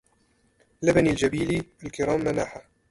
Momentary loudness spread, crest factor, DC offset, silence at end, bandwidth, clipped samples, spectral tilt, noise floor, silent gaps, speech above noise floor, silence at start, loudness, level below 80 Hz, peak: 13 LU; 18 dB; under 0.1%; 0.3 s; 11.5 kHz; under 0.1%; -6 dB/octave; -66 dBFS; none; 41 dB; 0.8 s; -25 LUFS; -48 dBFS; -8 dBFS